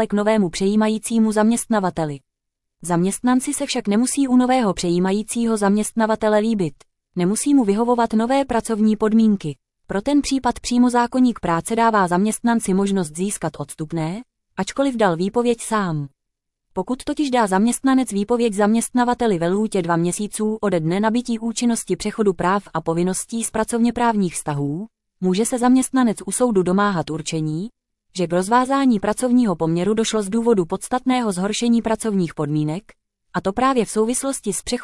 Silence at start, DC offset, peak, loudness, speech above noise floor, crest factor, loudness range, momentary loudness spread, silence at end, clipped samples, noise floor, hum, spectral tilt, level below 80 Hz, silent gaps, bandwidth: 0 s; under 0.1%; -4 dBFS; -20 LUFS; 60 dB; 16 dB; 3 LU; 9 LU; 0 s; under 0.1%; -79 dBFS; none; -5 dB/octave; -48 dBFS; none; 12 kHz